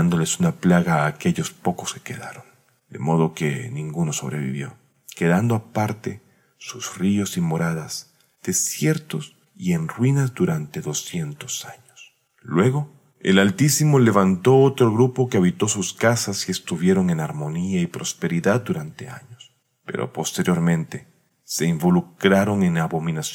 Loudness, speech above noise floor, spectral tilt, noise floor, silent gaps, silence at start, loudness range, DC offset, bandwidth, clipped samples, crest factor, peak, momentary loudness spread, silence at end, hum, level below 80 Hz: -21 LUFS; 31 dB; -5.5 dB/octave; -52 dBFS; none; 0 s; 8 LU; under 0.1%; 17 kHz; under 0.1%; 20 dB; -2 dBFS; 15 LU; 0 s; none; -60 dBFS